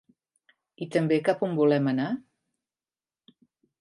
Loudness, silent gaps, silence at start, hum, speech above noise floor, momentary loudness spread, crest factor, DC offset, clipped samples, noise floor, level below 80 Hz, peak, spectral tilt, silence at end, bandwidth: -26 LUFS; none; 0.8 s; none; over 65 dB; 11 LU; 18 dB; under 0.1%; under 0.1%; under -90 dBFS; -78 dBFS; -10 dBFS; -7.5 dB/octave; 1.6 s; 11.5 kHz